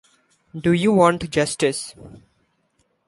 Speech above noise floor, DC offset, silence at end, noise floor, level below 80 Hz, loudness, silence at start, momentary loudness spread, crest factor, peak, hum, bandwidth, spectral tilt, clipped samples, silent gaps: 47 dB; under 0.1%; 0.9 s; -67 dBFS; -52 dBFS; -19 LUFS; 0.55 s; 16 LU; 20 dB; -2 dBFS; none; 11.5 kHz; -5 dB/octave; under 0.1%; none